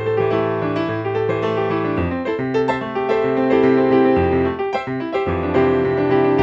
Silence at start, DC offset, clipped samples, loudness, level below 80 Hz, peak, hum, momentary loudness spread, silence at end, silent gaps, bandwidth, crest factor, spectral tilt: 0 s; under 0.1%; under 0.1%; -18 LUFS; -44 dBFS; -4 dBFS; none; 7 LU; 0 s; none; 7.4 kHz; 14 dB; -8.5 dB/octave